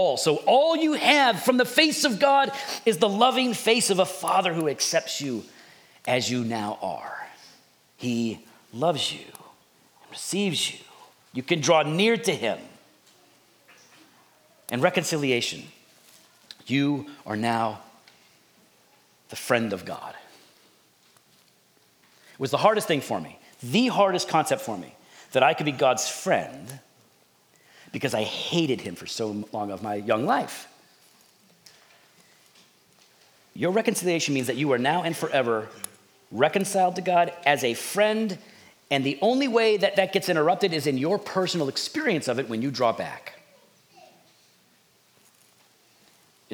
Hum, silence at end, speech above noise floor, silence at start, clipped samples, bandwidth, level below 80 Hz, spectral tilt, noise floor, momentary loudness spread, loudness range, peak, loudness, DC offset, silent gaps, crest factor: none; 0 s; 38 dB; 0 s; under 0.1%; over 20 kHz; -78 dBFS; -4 dB/octave; -62 dBFS; 17 LU; 9 LU; -4 dBFS; -24 LUFS; under 0.1%; none; 24 dB